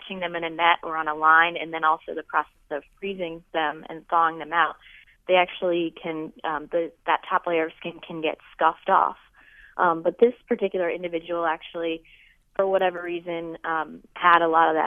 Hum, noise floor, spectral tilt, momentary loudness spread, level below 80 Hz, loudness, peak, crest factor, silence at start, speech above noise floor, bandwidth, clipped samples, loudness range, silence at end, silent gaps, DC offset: none; -52 dBFS; -7 dB/octave; 14 LU; -62 dBFS; -24 LUFS; -2 dBFS; 22 dB; 0.05 s; 28 dB; 4 kHz; under 0.1%; 4 LU; 0 s; none; under 0.1%